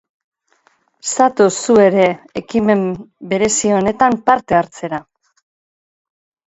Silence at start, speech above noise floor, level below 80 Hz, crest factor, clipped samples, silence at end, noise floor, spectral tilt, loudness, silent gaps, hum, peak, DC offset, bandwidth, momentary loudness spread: 1.05 s; 44 dB; -52 dBFS; 16 dB; under 0.1%; 1.45 s; -58 dBFS; -4.5 dB/octave; -15 LUFS; none; none; 0 dBFS; under 0.1%; 8.2 kHz; 14 LU